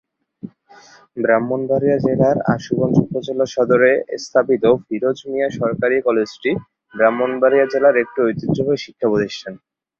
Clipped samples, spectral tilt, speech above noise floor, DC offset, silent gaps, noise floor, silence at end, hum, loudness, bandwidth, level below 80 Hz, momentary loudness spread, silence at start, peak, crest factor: under 0.1%; -7 dB/octave; 30 dB; under 0.1%; none; -47 dBFS; 0.45 s; none; -18 LUFS; 7.4 kHz; -54 dBFS; 11 LU; 0.45 s; -2 dBFS; 16 dB